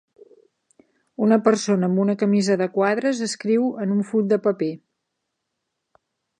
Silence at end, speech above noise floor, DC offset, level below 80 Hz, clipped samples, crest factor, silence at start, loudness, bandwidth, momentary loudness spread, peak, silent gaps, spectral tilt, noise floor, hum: 1.65 s; 59 dB; under 0.1%; -74 dBFS; under 0.1%; 20 dB; 1.2 s; -21 LUFS; 9.8 kHz; 7 LU; -2 dBFS; none; -6 dB/octave; -79 dBFS; none